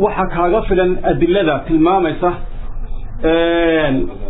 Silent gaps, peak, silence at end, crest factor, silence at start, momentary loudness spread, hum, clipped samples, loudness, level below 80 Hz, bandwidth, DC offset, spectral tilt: none; -2 dBFS; 0 s; 12 dB; 0 s; 18 LU; none; under 0.1%; -15 LUFS; -24 dBFS; 4 kHz; under 0.1%; -10.5 dB/octave